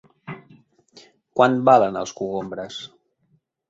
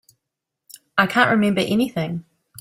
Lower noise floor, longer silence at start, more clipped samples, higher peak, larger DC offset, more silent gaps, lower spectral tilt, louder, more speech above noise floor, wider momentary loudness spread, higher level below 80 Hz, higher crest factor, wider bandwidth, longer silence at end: second, -66 dBFS vs -82 dBFS; second, 0.3 s vs 0.95 s; neither; about the same, -2 dBFS vs -2 dBFS; neither; neither; about the same, -5.5 dB/octave vs -5.5 dB/octave; about the same, -20 LUFS vs -19 LUFS; second, 46 dB vs 63 dB; first, 23 LU vs 11 LU; second, -64 dBFS vs -58 dBFS; about the same, 20 dB vs 20 dB; second, 7.8 kHz vs 15.5 kHz; first, 0.85 s vs 0.4 s